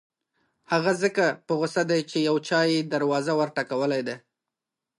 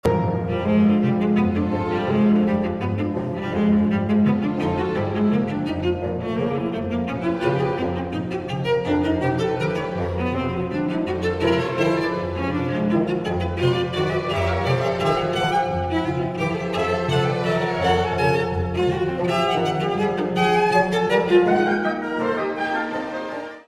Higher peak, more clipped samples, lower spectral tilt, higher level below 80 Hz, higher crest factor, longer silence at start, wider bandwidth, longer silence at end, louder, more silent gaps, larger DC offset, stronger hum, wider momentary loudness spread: about the same, -8 dBFS vs -6 dBFS; neither; second, -5 dB/octave vs -7 dB/octave; second, -78 dBFS vs -44 dBFS; about the same, 16 dB vs 16 dB; first, 0.7 s vs 0.05 s; about the same, 11.5 kHz vs 11.5 kHz; first, 0.8 s vs 0.05 s; second, -25 LUFS vs -22 LUFS; neither; neither; neither; about the same, 5 LU vs 6 LU